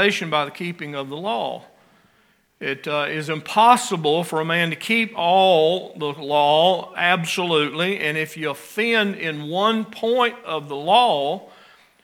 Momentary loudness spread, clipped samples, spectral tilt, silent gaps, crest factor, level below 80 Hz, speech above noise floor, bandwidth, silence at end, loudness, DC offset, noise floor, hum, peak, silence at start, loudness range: 12 LU; under 0.1%; -4 dB/octave; none; 20 dB; -76 dBFS; 40 dB; 17.5 kHz; 0.55 s; -20 LUFS; under 0.1%; -61 dBFS; none; 0 dBFS; 0 s; 4 LU